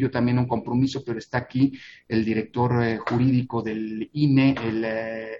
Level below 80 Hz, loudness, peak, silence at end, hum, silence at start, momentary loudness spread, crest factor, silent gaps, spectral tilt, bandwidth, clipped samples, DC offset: -56 dBFS; -24 LUFS; -6 dBFS; 0 s; none; 0 s; 9 LU; 16 dB; none; -8 dB/octave; 7.4 kHz; under 0.1%; under 0.1%